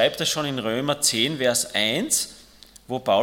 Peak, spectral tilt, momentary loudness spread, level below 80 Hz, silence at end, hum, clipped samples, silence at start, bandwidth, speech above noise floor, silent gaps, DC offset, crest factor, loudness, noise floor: -6 dBFS; -2.5 dB/octave; 7 LU; -58 dBFS; 0 s; none; under 0.1%; 0 s; 17.5 kHz; 26 dB; none; under 0.1%; 18 dB; -22 LUFS; -49 dBFS